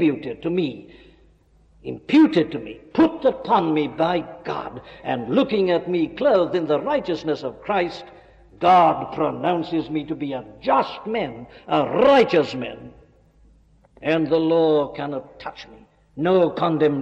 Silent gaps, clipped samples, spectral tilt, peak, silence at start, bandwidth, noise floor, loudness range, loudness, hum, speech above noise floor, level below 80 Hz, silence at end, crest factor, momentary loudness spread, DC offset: none; under 0.1%; -7.5 dB/octave; -8 dBFS; 0 s; 7.6 kHz; -56 dBFS; 2 LU; -21 LUFS; none; 35 dB; -56 dBFS; 0 s; 14 dB; 17 LU; under 0.1%